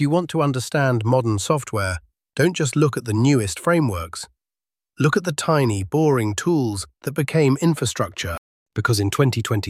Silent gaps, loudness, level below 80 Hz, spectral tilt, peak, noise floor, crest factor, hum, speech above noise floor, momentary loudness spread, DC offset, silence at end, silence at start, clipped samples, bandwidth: 8.38-8.66 s; -21 LUFS; -48 dBFS; -5.5 dB/octave; -4 dBFS; under -90 dBFS; 16 dB; none; over 70 dB; 10 LU; under 0.1%; 0 s; 0 s; under 0.1%; 15.5 kHz